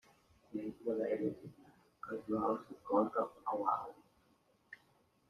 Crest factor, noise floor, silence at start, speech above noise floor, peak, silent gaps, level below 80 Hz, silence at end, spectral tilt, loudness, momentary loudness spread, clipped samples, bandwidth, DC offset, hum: 22 dB; -73 dBFS; 0.5 s; 35 dB; -18 dBFS; none; -76 dBFS; 0.55 s; -8.5 dB/octave; -38 LUFS; 22 LU; under 0.1%; 13 kHz; under 0.1%; none